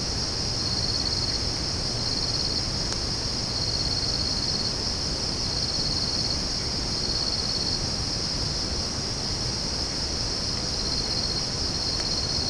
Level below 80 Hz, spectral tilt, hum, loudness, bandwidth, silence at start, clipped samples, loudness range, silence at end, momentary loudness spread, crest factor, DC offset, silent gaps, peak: -38 dBFS; -3 dB/octave; none; -25 LUFS; 10.5 kHz; 0 s; under 0.1%; 1 LU; 0 s; 2 LU; 16 dB; under 0.1%; none; -10 dBFS